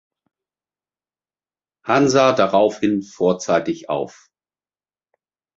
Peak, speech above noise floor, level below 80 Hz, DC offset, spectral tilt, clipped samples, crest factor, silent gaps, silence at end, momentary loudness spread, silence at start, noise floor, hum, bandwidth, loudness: -2 dBFS; over 72 dB; -62 dBFS; under 0.1%; -5 dB/octave; under 0.1%; 20 dB; none; 1.5 s; 11 LU; 1.85 s; under -90 dBFS; none; 7.8 kHz; -18 LUFS